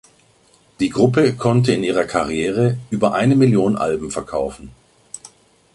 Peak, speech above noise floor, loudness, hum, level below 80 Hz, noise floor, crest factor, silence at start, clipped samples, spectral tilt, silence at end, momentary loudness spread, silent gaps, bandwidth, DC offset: -2 dBFS; 38 dB; -18 LUFS; none; -48 dBFS; -55 dBFS; 18 dB; 0.8 s; under 0.1%; -6.5 dB/octave; 0.6 s; 12 LU; none; 11.5 kHz; under 0.1%